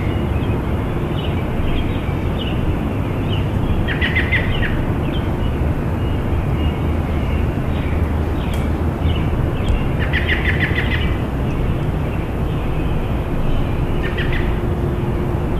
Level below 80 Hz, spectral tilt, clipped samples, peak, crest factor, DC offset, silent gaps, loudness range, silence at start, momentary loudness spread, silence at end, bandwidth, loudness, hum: -24 dBFS; -7.5 dB/octave; under 0.1%; -4 dBFS; 14 dB; under 0.1%; none; 2 LU; 0 s; 4 LU; 0 s; 14 kHz; -20 LUFS; none